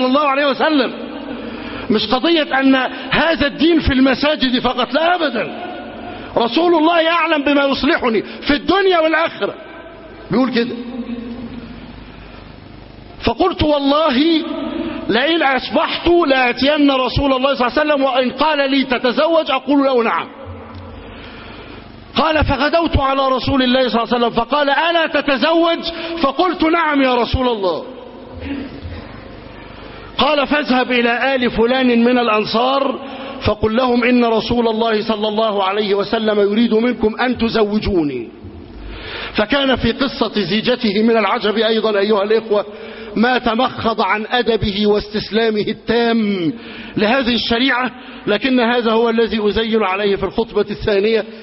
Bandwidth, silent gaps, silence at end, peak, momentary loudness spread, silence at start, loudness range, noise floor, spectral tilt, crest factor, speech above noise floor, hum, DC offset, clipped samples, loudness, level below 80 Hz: 6 kHz; none; 0 s; 0 dBFS; 16 LU; 0 s; 4 LU; -37 dBFS; -8.5 dB/octave; 16 dB; 21 dB; none; under 0.1%; under 0.1%; -16 LUFS; -36 dBFS